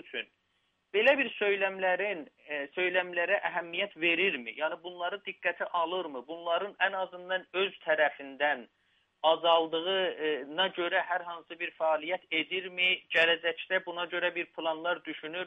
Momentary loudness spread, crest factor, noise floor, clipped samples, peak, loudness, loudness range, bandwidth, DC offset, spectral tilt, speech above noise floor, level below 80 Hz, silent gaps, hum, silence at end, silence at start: 11 LU; 20 dB; -76 dBFS; under 0.1%; -10 dBFS; -30 LUFS; 3 LU; 8 kHz; under 0.1%; -5 dB/octave; 45 dB; -84 dBFS; none; none; 0 s; 0.05 s